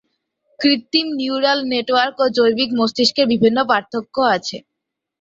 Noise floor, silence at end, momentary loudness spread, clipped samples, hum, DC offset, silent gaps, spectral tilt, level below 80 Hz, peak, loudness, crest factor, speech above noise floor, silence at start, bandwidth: -69 dBFS; 0.65 s; 6 LU; under 0.1%; none; under 0.1%; none; -4 dB/octave; -60 dBFS; -2 dBFS; -17 LUFS; 16 dB; 51 dB; 0.6 s; 7.8 kHz